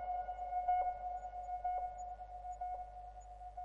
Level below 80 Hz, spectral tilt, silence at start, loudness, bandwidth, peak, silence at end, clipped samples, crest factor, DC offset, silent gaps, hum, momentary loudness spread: -58 dBFS; -5 dB/octave; 0 s; -42 LUFS; 7.4 kHz; -26 dBFS; 0 s; under 0.1%; 16 dB; under 0.1%; none; 50 Hz at -55 dBFS; 15 LU